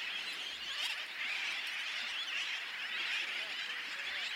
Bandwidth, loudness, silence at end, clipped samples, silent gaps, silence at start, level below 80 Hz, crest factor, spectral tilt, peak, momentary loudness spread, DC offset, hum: 16.5 kHz; -37 LUFS; 0 s; under 0.1%; none; 0 s; -84 dBFS; 16 dB; 1.5 dB/octave; -24 dBFS; 3 LU; under 0.1%; none